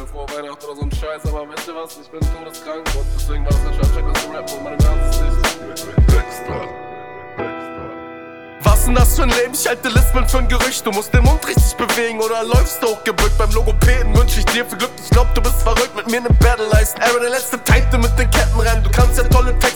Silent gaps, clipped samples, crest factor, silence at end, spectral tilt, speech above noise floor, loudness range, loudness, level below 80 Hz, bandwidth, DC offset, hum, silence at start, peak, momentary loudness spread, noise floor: none; under 0.1%; 14 dB; 0 s; -4.5 dB/octave; 20 dB; 7 LU; -17 LUFS; -16 dBFS; 19.5 kHz; 0.6%; none; 0 s; 0 dBFS; 14 LU; -34 dBFS